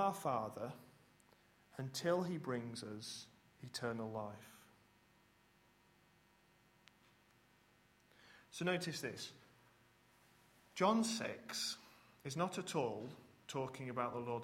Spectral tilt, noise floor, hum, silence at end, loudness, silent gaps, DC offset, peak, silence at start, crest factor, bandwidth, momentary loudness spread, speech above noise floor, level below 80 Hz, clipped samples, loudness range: -4.5 dB/octave; -72 dBFS; none; 0 s; -42 LUFS; none; under 0.1%; -20 dBFS; 0 s; 24 dB; 16 kHz; 17 LU; 30 dB; -80 dBFS; under 0.1%; 10 LU